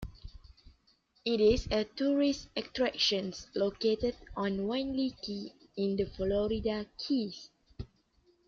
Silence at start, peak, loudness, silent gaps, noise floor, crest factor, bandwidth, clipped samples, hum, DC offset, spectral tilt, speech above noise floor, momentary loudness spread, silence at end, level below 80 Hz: 0 s; -16 dBFS; -32 LUFS; none; -70 dBFS; 18 dB; 7.6 kHz; under 0.1%; none; under 0.1%; -5 dB/octave; 38 dB; 16 LU; 0.6 s; -50 dBFS